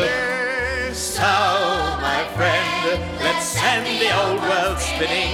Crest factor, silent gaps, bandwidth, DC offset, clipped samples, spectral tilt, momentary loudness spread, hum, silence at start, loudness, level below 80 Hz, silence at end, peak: 14 dB; none; 19 kHz; under 0.1%; under 0.1%; -3 dB/octave; 4 LU; none; 0 s; -20 LUFS; -38 dBFS; 0 s; -6 dBFS